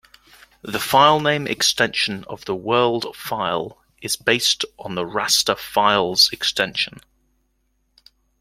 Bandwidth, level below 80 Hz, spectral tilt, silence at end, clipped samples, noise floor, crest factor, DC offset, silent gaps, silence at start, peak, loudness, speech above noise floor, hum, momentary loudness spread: 16.5 kHz; -58 dBFS; -2 dB/octave; 1.5 s; under 0.1%; -68 dBFS; 20 dB; under 0.1%; none; 0.65 s; -2 dBFS; -19 LUFS; 47 dB; none; 13 LU